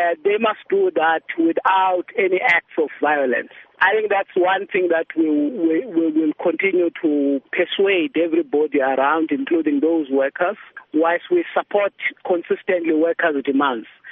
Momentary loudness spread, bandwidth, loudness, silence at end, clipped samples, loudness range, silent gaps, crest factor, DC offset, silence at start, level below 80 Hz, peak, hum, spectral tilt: 4 LU; 4.5 kHz; -19 LUFS; 0 s; under 0.1%; 2 LU; none; 16 dB; under 0.1%; 0 s; -72 dBFS; -4 dBFS; none; -2 dB/octave